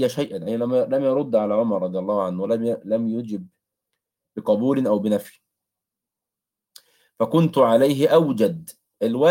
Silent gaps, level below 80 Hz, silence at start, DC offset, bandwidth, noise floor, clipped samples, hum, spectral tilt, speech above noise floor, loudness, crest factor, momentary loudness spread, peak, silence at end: none; -70 dBFS; 0 s; under 0.1%; 17 kHz; -87 dBFS; under 0.1%; none; -7 dB/octave; 67 dB; -21 LUFS; 16 dB; 10 LU; -4 dBFS; 0 s